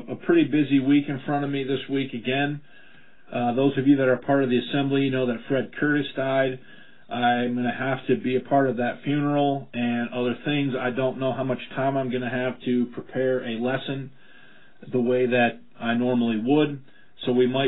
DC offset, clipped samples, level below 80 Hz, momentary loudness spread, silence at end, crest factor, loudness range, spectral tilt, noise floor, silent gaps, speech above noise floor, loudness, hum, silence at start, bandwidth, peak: 0.6%; under 0.1%; -66 dBFS; 7 LU; 0 s; 16 dB; 3 LU; -11 dB/octave; -53 dBFS; none; 30 dB; -24 LUFS; none; 0 s; 4.1 kHz; -8 dBFS